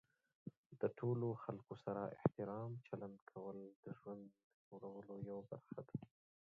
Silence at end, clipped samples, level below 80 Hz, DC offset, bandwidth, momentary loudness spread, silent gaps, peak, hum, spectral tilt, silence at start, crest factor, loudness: 0.45 s; under 0.1%; -80 dBFS; under 0.1%; 4.9 kHz; 17 LU; 0.57-0.70 s, 3.22-3.27 s, 3.76-3.83 s, 4.44-4.71 s; -22 dBFS; none; -9.5 dB/octave; 0.45 s; 26 dB; -48 LUFS